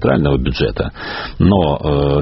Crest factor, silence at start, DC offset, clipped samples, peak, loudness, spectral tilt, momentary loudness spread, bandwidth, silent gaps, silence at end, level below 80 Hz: 14 dB; 0 s; under 0.1%; under 0.1%; 0 dBFS; -16 LUFS; -6 dB/octave; 10 LU; 6 kHz; none; 0 s; -26 dBFS